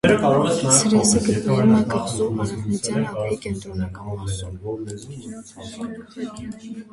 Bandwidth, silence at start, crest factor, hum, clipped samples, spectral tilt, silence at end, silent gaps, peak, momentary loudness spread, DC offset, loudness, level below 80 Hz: 11.5 kHz; 0.05 s; 20 dB; none; under 0.1%; -4.5 dB/octave; 0.1 s; none; 0 dBFS; 19 LU; under 0.1%; -20 LUFS; -44 dBFS